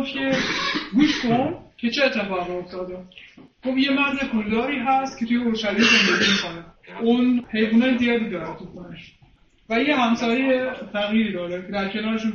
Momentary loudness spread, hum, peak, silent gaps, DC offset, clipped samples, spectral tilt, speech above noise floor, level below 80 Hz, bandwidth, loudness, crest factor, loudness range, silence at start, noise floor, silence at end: 14 LU; none; -4 dBFS; none; under 0.1%; under 0.1%; -4.5 dB/octave; 33 dB; -54 dBFS; 7 kHz; -21 LUFS; 18 dB; 4 LU; 0 s; -55 dBFS; 0 s